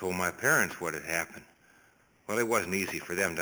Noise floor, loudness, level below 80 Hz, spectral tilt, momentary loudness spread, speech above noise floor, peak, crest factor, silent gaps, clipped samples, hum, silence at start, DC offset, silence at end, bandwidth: -64 dBFS; -30 LUFS; -66 dBFS; -3.5 dB/octave; 12 LU; 33 dB; -12 dBFS; 20 dB; none; under 0.1%; none; 0 s; under 0.1%; 0 s; over 20 kHz